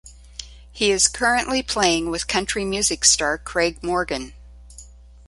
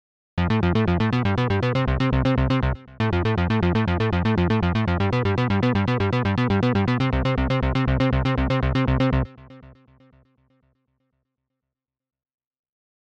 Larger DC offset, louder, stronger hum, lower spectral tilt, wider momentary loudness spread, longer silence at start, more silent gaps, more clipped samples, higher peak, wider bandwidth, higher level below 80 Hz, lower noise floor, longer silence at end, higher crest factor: neither; about the same, -20 LUFS vs -22 LUFS; first, 60 Hz at -40 dBFS vs none; second, -1.5 dB/octave vs -8 dB/octave; first, 21 LU vs 2 LU; second, 0.05 s vs 0.35 s; neither; neither; first, -2 dBFS vs -12 dBFS; first, 11.5 kHz vs 7.2 kHz; second, -42 dBFS vs -32 dBFS; second, -44 dBFS vs -86 dBFS; second, 0.35 s vs 3.45 s; first, 22 dB vs 12 dB